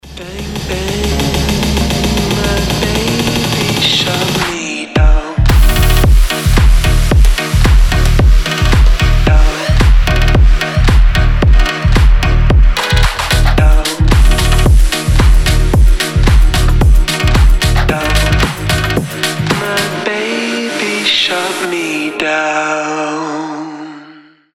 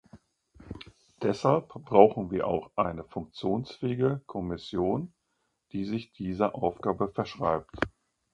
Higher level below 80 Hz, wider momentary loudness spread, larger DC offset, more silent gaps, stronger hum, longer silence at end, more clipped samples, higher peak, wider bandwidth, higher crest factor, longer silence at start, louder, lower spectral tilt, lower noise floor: first, -12 dBFS vs -56 dBFS; second, 6 LU vs 14 LU; neither; neither; neither; about the same, 0.4 s vs 0.45 s; neither; first, 0 dBFS vs -4 dBFS; first, 16.5 kHz vs 9.2 kHz; second, 10 dB vs 26 dB; about the same, 0.05 s vs 0.15 s; first, -12 LUFS vs -29 LUFS; second, -4.5 dB/octave vs -8 dB/octave; second, -40 dBFS vs -78 dBFS